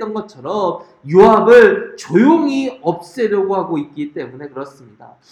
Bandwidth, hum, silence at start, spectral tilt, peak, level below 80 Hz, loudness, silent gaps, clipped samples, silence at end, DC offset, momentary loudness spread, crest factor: 11 kHz; none; 0 s; -6.5 dB/octave; 0 dBFS; -52 dBFS; -13 LUFS; none; 0.2%; 0.6 s; under 0.1%; 21 LU; 14 dB